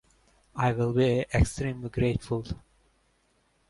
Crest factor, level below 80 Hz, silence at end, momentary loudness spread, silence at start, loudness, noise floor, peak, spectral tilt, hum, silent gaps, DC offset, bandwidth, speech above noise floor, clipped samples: 18 dB; -40 dBFS; 1.15 s; 13 LU; 0.55 s; -28 LUFS; -69 dBFS; -10 dBFS; -6.5 dB/octave; none; none; under 0.1%; 11.5 kHz; 42 dB; under 0.1%